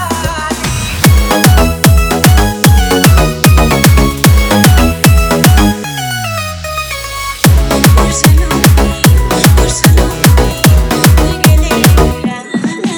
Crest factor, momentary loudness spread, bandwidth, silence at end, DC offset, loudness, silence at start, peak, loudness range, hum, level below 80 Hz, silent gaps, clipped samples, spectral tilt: 8 dB; 9 LU; over 20 kHz; 0 s; under 0.1%; -9 LUFS; 0 s; 0 dBFS; 3 LU; none; -12 dBFS; none; 0.5%; -5 dB/octave